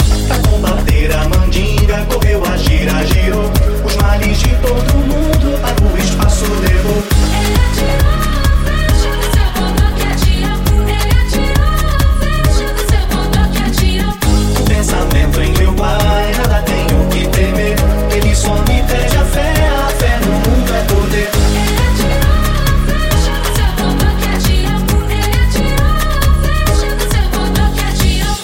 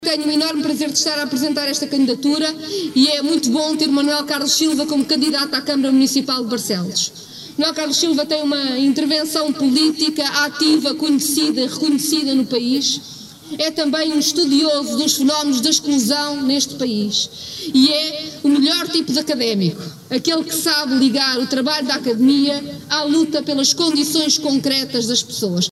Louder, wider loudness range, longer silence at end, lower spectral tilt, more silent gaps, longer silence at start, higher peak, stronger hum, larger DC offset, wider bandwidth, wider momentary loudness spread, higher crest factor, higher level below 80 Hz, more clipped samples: first, -13 LUFS vs -17 LUFS; about the same, 1 LU vs 2 LU; about the same, 0 s vs 0 s; first, -5 dB/octave vs -3 dB/octave; neither; about the same, 0 s vs 0 s; about the same, 0 dBFS vs -2 dBFS; neither; neither; first, 17 kHz vs 15 kHz; second, 1 LU vs 6 LU; second, 10 dB vs 16 dB; first, -12 dBFS vs -64 dBFS; neither